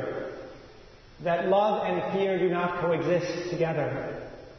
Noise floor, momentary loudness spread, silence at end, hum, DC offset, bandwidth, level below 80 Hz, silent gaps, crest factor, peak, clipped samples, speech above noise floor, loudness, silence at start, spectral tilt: -50 dBFS; 14 LU; 0 s; none; under 0.1%; 6.4 kHz; -58 dBFS; none; 16 dB; -12 dBFS; under 0.1%; 24 dB; -27 LUFS; 0 s; -6.5 dB/octave